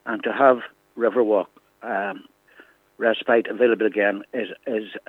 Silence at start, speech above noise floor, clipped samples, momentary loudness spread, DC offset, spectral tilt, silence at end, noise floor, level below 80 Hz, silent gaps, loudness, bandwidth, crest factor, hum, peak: 0.05 s; 31 dB; under 0.1%; 13 LU; under 0.1%; -7 dB/octave; 0.1 s; -53 dBFS; -78 dBFS; none; -22 LUFS; 4.1 kHz; 20 dB; none; -4 dBFS